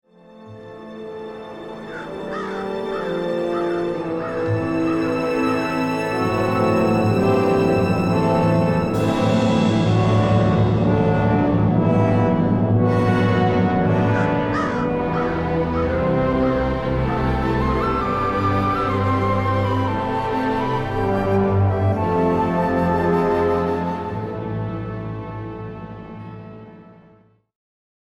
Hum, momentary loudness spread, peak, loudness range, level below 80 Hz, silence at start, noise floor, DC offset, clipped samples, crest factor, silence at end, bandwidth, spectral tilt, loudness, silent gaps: none; 14 LU; -6 dBFS; 8 LU; -38 dBFS; 0.35 s; -53 dBFS; under 0.1%; under 0.1%; 14 dB; 1.1 s; 11 kHz; -8 dB/octave; -20 LUFS; none